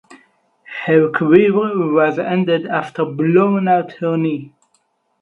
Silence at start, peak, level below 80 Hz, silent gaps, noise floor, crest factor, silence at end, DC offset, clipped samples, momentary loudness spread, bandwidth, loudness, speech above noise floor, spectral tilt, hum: 0.1 s; 0 dBFS; -64 dBFS; none; -64 dBFS; 16 dB; 0.75 s; under 0.1%; under 0.1%; 10 LU; 6.4 kHz; -16 LUFS; 48 dB; -9 dB/octave; none